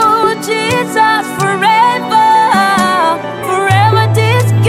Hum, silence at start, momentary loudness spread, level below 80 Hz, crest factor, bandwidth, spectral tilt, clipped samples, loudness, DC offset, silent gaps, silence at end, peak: none; 0 s; 5 LU; -48 dBFS; 10 dB; 15.5 kHz; -5 dB/octave; under 0.1%; -10 LUFS; under 0.1%; none; 0 s; 0 dBFS